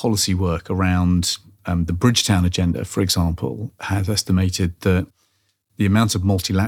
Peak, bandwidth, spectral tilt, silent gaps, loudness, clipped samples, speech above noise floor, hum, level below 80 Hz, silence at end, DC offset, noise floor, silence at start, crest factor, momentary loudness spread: -2 dBFS; 16.5 kHz; -5 dB/octave; none; -20 LUFS; under 0.1%; 48 dB; none; -38 dBFS; 0 s; under 0.1%; -67 dBFS; 0 s; 18 dB; 8 LU